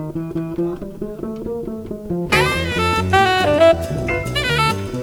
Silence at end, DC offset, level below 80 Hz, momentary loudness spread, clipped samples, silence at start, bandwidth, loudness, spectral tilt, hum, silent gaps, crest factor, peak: 0 s; under 0.1%; -36 dBFS; 14 LU; under 0.1%; 0 s; over 20 kHz; -18 LUFS; -5 dB/octave; none; none; 18 dB; -2 dBFS